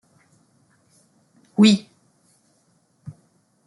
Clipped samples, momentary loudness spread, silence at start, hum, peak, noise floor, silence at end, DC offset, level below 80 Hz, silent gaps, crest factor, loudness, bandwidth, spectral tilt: under 0.1%; 28 LU; 1.6 s; none; -4 dBFS; -64 dBFS; 0.55 s; under 0.1%; -66 dBFS; none; 22 dB; -18 LUFS; 11 kHz; -5.5 dB/octave